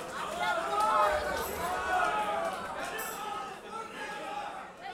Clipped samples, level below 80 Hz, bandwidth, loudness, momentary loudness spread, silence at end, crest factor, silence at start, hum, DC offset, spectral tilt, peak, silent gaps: under 0.1%; -56 dBFS; 19.5 kHz; -32 LUFS; 13 LU; 0 s; 18 dB; 0 s; none; under 0.1%; -2.5 dB/octave; -14 dBFS; none